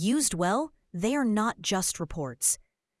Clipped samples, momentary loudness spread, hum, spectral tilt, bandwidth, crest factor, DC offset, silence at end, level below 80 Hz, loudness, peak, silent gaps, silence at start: under 0.1%; 8 LU; none; -3.5 dB/octave; 12 kHz; 18 dB; under 0.1%; 0.45 s; -52 dBFS; -28 LUFS; -10 dBFS; none; 0 s